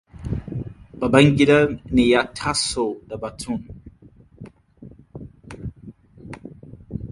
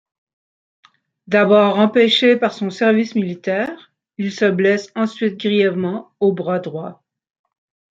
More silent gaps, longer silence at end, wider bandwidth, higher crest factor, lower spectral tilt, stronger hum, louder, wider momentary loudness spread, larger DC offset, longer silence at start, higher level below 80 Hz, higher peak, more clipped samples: neither; second, 0 s vs 1 s; first, 11.5 kHz vs 7.8 kHz; first, 22 dB vs 16 dB; about the same, -5.5 dB/octave vs -6 dB/octave; neither; second, -20 LUFS vs -17 LUFS; first, 25 LU vs 13 LU; neither; second, 0.15 s vs 1.3 s; first, -42 dBFS vs -68 dBFS; about the same, 0 dBFS vs -2 dBFS; neither